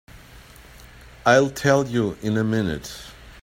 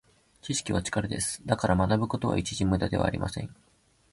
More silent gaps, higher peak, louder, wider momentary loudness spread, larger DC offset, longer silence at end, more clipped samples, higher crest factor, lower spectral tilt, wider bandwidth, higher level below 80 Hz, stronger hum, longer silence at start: neither; first, -2 dBFS vs -10 dBFS; first, -21 LUFS vs -28 LUFS; first, 18 LU vs 9 LU; neither; second, 0.1 s vs 0.6 s; neither; about the same, 20 dB vs 20 dB; about the same, -5.5 dB/octave vs -5 dB/octave; first, 16.5 kHz vs 11.5 kHz; about the same, -48 dBFS vs -44 dBFS; neither; second, 0.15 s vs 0.45 s